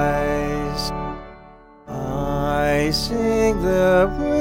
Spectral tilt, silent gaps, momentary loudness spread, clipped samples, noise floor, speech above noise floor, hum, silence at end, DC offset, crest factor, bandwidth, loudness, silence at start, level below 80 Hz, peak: -5.5 dB/octave; none; 13 LU; under 0.1%; -45 dBFS; 27 dB; none; 0 s; 0.2%; 14 dB; 17 kHz; -20 LUFS; 0 s; -32 dBFS; -6 dBFS